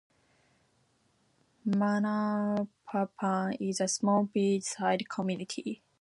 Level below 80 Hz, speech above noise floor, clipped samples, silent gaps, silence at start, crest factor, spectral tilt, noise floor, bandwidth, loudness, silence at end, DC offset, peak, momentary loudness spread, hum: -78 dBFS; 41 dB; under 0.1%; none; 1.65 s; 18 dB; -5 dB/octave; -71 dBFS; 11.5 kHz; -31 LUFS; 0.25 s; under 0.1%; -14 dBFS; 8 LU; none